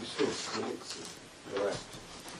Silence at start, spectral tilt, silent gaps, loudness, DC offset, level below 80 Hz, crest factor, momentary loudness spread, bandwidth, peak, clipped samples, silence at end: 0 s; -3 dB/octave; none; -37 LUFS; under 0.1%; -64 dBFS; 20 dB; 12 LU; 13 kHz; -18 dBFS; under 0.1%; 0 s